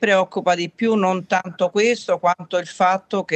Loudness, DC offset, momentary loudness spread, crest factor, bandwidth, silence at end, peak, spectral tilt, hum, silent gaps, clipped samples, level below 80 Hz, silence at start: -20 LUFS; under 0.1%; 5 LU; 16 dB; 8.8 kHz; 0 s; -4 dBFS; -4.5 dB/octave; none; none; under 0.1%; -72 dBFS; 0 s